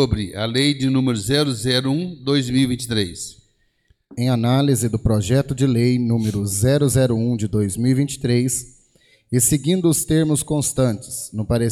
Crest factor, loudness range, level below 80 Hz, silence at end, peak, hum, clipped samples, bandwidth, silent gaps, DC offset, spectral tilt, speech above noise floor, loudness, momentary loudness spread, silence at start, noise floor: 14 dB; 3 LU; -42 dBFS; 0 s; -6 dBFS; none; under 0.1%; 16 kHz; none; under 0.1%; -5 dB/octave; 43 dB; -19 LUFS; 6 LU; 0 s; -62 dBFS